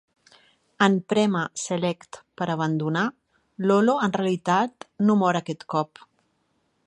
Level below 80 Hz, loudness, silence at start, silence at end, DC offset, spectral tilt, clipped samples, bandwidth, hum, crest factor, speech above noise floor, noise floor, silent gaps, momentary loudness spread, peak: -70 dBFS; -24 LUFS; 0.8 s; 1 s; under 0.1%; -5.5 dB/octave; under 0.1%; 10.5 kHz; none; 22 dB; 47 dB; -70 dBFS; none; 9 LU; -2 dBFS